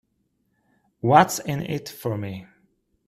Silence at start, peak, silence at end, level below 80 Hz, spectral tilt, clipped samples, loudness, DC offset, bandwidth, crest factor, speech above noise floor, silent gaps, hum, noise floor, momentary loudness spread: 1.05 s; 0 dBFS; 0.65 s; -60 dBFS; -5 dB/octave; under 0.1%; -22 LUFS; under 0.1%; 15 kHz; 24 dB; 49 dB; none; none; -71 dBFS; 15 LU